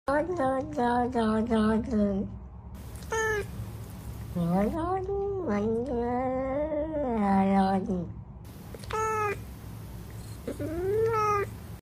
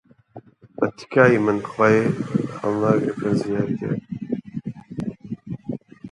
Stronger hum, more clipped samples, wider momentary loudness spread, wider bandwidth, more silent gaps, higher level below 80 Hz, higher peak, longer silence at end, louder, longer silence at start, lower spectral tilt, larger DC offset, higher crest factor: neither; neither; about the same, 17 LU vs 17 LU; first, 15.5 kHz vs 11 kHz; neither; first, -46 dBFS vs -58 dBFS; second, -12 dBFS vs 0 dBFS; about the same, 0 s vs 0.05 s; second, -29 LUFS vs -22 LUFS; second, 0.05 s vs 0.35 s; about the same, -7 dB/octave vs -8 dB/octave; neither; second, 16 dB vs 22 dB